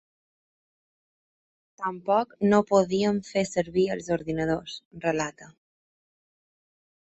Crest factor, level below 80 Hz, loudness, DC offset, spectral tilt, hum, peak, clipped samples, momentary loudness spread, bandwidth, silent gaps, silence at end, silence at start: 20 dB; -60 dBFS; -26 LUFS; under 0.1%; -5.5 dB/octave; none; -8 dBFS; under 0.1%; 11 LU; 8.2 kHz; 4.85-4.91 s; 1.5 s; 1.8 s